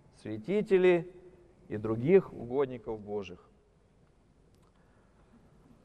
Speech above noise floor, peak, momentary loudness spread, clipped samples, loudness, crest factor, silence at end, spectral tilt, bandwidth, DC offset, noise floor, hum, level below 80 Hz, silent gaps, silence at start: 35 dB; -12 dBFS; 17 LU; under 0.1%; -30 LUFS; 20 dB; 2.5 s; -8.5 dB/octave; 8.6 kHz; under 0.1%; -65 dBFS; none; -64 dBFS; none; 0.25 s